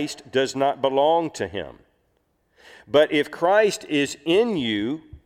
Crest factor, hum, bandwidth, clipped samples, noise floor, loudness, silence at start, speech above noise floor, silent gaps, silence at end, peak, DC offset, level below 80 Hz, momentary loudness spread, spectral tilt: 18 dB; none; 15 kHz; under 0.1%; -68 dBFS; -22 LUFS; 0 s; 46 dB; none; 0.1 s; -6 dBFS; under 0.1%; -58 dBFS; 11 LU; -4.5 dB/octave